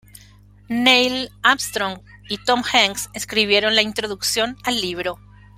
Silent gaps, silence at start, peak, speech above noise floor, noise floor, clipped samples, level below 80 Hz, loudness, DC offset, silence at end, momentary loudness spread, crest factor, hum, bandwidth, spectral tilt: none; 0.7 s; 0 dBFS; 28 dB; -48 dBFS; under 0.1%; -52 dBFS; -18 LUFS; under 0.1%; 0.4 s; 12 LU; 20 dB; 50 Hz at -45 dBFS; 16.5 kHz; -2 dB/octave